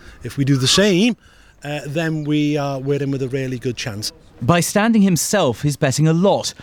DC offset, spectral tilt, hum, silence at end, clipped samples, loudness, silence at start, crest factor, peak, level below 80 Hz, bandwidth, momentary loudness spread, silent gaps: under 0.1%; -5 dB/octave; none; 0.1 s; under 0.1%; -18 LUFS; 0.05 s; 16 dB; -2 dBFS; -48 dBFS; 18.5 kHz; 13 LU; none